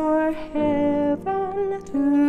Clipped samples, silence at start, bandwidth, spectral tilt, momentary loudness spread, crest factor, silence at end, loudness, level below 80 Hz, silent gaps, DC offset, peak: under 0.1%; 0 s; 7.6 kHz; -8 dB/octave; 4 LU; 10 dB; 0 s; -23 LUFS; -48 dBFS; none; under 0.1%; -12 dBFS